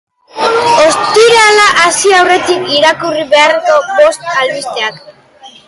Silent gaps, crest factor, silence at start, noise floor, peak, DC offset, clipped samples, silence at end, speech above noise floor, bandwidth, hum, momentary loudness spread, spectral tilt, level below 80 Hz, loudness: none; 10 dB; 0.35 s; -37 dBFS; 0 dBFS; under 0.1%; under 0.1%; 0.2 s; 27 dB; 11.5 kHz; none; 10 LU; -1.5 dB/octave; -50 dBFS; -8 LUFS